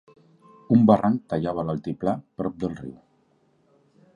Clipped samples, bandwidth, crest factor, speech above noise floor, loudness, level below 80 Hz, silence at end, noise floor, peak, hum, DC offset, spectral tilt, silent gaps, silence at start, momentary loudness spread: under 0.1%; 6.8 kHz; 22 dB; 41 dB; -24 LUFS; -56 dBFS; 1.25 s; -64 dBFS; -4 dBFS; none; under 0.1%; -10 dB/octave; none; 0.7 s; 14 LU